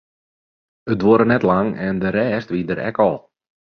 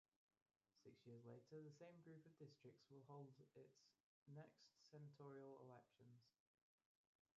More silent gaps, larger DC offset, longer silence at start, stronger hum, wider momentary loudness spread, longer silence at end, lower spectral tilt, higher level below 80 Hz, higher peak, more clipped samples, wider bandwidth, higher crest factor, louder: second, none vs 4.03-4.26 s; neither; about the same, 0.85 s vs 0.75 s; neither; first, 10 LU vs 6 LU; second, 0.6 s vs 1.05 s; first, -9 dB/octave vs -7 dB/octave; first, -50 dBFS vs under -90 dBFS; first, -2 dBFS vs -50 dBFS; neither; second, 6.4 kHz vs 7.2 kHz; about the same, 18 dB vs 16 dB; first, -18 LUFS vs -65 LUFS